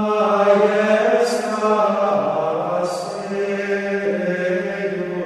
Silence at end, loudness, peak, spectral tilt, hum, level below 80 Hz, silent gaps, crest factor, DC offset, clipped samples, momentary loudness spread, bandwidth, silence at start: 0 s; -19 LUFS; -2 dBFS; -5.5 dB/octave; none; -66 dBFS; none; 16 dB; under 0.1%; under 0.1%; 9 LU; 12.5 kHz; 0 s